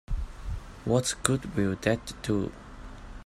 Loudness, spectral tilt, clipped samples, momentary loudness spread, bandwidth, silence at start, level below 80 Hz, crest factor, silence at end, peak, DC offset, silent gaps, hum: -30 LUFS; -5 dB/octave; under 0.1%; 19 LU; 16 kHz; 0.1 s; -40 dBFS; 26 dB; 0 s; -4 dBFS; under 0.1%; none; none